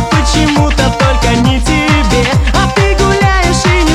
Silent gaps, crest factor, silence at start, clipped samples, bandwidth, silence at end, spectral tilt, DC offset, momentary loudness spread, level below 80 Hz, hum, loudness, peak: none; 10 dB; 0 s; under 0.1%; 13.5 kHz; 0 s; -5 dB/octave; under 0.1%; 1 LU; -16 dBFS; none; -10 LUFS; 0 dBFS